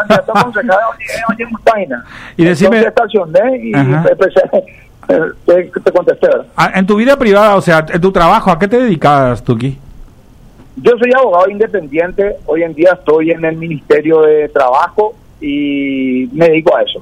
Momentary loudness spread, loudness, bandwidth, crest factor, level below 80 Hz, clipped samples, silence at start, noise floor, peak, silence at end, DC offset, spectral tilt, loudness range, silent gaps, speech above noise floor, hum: 8 LU; -11 LUFS; 15.5 kHz; 10 dB; -38 dBFS; under 0.1%; 0 s; -39 dBFS; 0 dBFS; 0 s; under 0.1%; -7 dB/octave; 3 LU; none; 29 dB; none